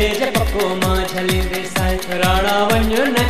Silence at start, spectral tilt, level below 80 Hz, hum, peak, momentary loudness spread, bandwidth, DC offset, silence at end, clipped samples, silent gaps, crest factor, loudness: 0 s; -4.5 dB/octave; -26 dBFS; none; -2 dBFS; 4 LU; 14 kHz; 2%; 0 s; under 0.1%; none; 14 dB; -17 LUFS